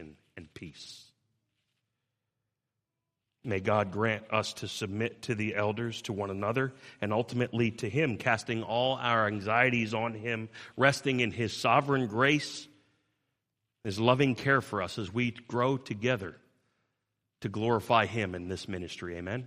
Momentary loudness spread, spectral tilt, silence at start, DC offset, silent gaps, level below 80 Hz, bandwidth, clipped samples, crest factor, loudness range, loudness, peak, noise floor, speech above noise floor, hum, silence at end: 13 LU; -5.5 dB/octave; 0 s; under 0.1%; none; -68 dBFS; 15 kHz; under 0.1%; 24 dB; 5 LU; -30 LUFS; -8 dBFS; -86 dBFS; 56 dB; none; 0 s